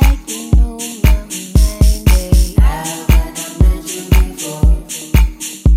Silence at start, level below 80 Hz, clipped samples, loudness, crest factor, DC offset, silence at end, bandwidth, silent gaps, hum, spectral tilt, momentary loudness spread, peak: 0 s; -12 dBFS; under 0.1%; -15 LUFS; 12 dB; under 0.1%; 0 s; 16 kHz; none; none; -5 dB/octave; 7 LU; 0 dBFS